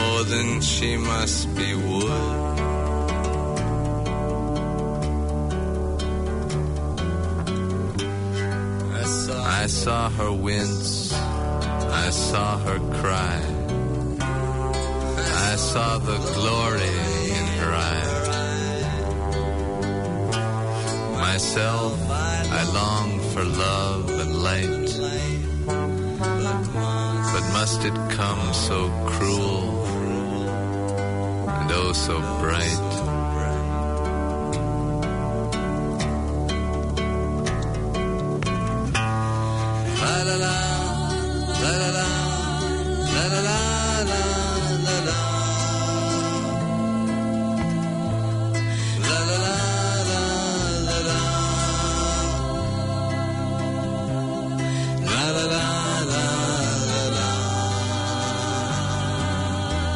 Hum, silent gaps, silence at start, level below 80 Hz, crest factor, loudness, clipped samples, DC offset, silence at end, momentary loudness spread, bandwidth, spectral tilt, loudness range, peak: none; none; 0 s; -34 dBFS; 12 dB; -24 LUFS; under 0.1%; under 0.1%; 0 s; 4 LU; 11 kHz; -4.5 dB/octave; 3 LU; -10 dBFS